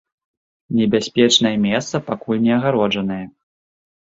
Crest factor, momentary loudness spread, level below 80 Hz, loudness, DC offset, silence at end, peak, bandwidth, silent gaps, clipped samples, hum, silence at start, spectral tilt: 18 dB; 11 LU; -56 dBFS; -18 LUFS; under 0.1%; 0.85 s; -2 dBFS; 7.8 kHz; none; under 0.1%; none; 0.7 s; -4.5 dB/octave